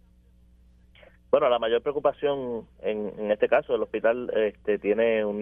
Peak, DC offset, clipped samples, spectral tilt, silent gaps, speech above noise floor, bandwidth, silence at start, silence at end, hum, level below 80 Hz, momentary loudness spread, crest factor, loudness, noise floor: -6 dBFS; under 0.1%; under 0.1%; -8 dB/octave; none; 32 dB; 3.8 kHz; 1.3 s; 0 s; none; -58 dBFS; 8 LU; 20 dB; -26 LUFS; -57 dBFS